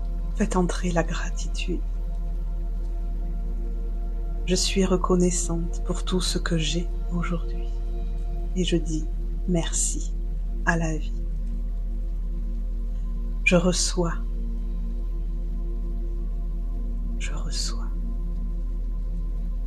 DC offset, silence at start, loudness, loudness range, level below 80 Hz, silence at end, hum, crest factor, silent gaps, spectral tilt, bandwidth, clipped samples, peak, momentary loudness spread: under 0.1%; 0 s; -28 LUFS; 6 LU; -26 dBFS; 0 s; none; 18 dB; none; -4.5 dB/octave; 12 kHz; under 0.1%; -6 dBFS; 10 LU